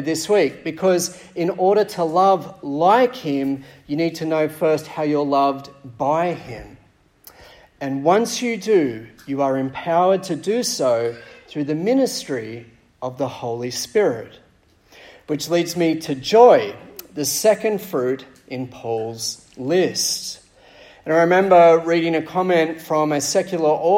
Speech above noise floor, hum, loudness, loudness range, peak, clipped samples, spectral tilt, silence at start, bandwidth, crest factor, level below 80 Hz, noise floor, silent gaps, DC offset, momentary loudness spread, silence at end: 37 dB; none; -19 LUFS; 6 LU; -2 dBFS; under 0.1%; -4.5 dB/octave; 0 s; 16.5 kHz; 18 dB; -60 dBFS; -56 dBFS; none; under 0.1%; 15 LU; 0 s